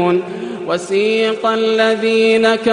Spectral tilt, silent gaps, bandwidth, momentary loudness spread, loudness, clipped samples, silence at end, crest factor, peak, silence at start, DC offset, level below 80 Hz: -4.5 dB/octave; none; 10.5 kHz; 9 LU; -15 LUFS; under 0.1%; 0 s; 12 dB; -2 dBFS; 0 s; under 0.1%; -60 dBFS